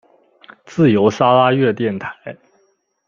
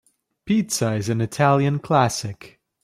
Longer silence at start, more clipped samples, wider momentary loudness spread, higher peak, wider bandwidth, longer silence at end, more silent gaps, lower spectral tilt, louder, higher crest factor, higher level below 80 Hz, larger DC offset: first, 0.7 s vs 0.45 s; neither; first, 18 LU vs 10 LU; about the same, -2 dBFS vs -4 dBFS; second, 7.4 kHz vs 15.5 kHz; first, 0.75 s vs 0.35 s; neither; first, -7 dB/octave vs -5.5 dB/octave; first, -15 LUFS vs -21 LUFS; about the same, 16 dB vs 18 dB; about the same, -58 dBFS vs -58 dBFS; neither